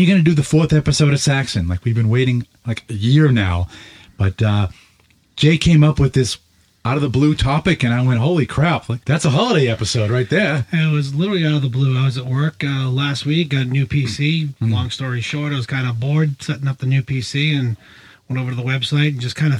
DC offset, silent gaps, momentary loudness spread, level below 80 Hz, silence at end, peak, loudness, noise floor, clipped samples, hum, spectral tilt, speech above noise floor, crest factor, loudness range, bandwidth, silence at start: under 0.1%; none; 8 LU; -38 dBFS; 0 s; -2 dBFS; -17 LUFS; -55 dBFS; under 0.1%; none; -6 dB/octave; 39 dB; 16 dB; 4 LU; 11.5 kHz; 0 s